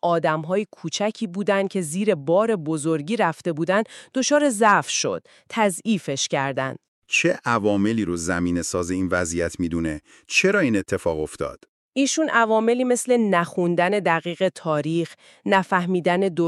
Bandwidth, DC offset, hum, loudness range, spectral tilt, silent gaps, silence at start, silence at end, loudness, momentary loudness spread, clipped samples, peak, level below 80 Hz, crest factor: 14 kHz; under 0.1%; none; 2 LU; -4.5 dB/octave; 6.88-7.02 s, 11.69-11.92 s; 0.05 s; 0 s; -22 LUFS; 8 LU; under 0.1%; -4 dBFS; -56 dBFS; 18 dB